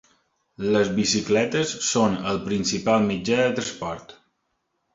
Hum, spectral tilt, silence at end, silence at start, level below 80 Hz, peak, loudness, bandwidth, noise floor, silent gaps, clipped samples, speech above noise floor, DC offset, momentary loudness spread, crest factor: none; -4 dB/octave; 0.8 s; 0.6 s; -54 dBFS; -6 dBFS; -23 LUFS; 7.8 kHz; -74 dBFS; none; under 0.1%; 52 dB; under 0.1%; 9 LU; 18 dB